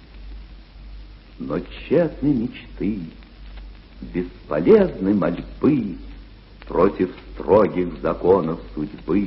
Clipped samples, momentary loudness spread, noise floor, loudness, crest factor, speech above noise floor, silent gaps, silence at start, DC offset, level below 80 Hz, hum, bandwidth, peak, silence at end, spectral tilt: under 0.1%; 25 LU; -42 dBFS; -21 LUFS; 20 dB; 21 dB; none; 0.1 s; under 0.1%; -40 dBFS; none; 5.8 kHz; -2 dBFS; 0 s; -7.5 dB/octave